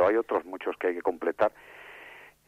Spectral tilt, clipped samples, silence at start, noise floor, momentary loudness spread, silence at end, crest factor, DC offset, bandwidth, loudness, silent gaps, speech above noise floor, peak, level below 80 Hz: -6 dB/octave; under 0.1%; 0 s; -50 dBFS; 19 LU; 0.25 s; 16 dB; under 0.1%; 15 kHz; -29 LUFS; none; 21 dB; -12 dBFS; -68 dBFS